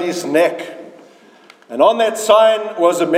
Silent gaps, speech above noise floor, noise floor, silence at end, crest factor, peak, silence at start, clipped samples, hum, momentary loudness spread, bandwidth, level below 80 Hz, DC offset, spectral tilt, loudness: none; 32 dB; -46 dBFS; 0 s; 16 dB; 0 dBFS; 0 s; under 0.1%; none; 18 LU; 16 kHz; -68 dBFS; under 0.1%; -3.5 dB/octave; -14 LUFS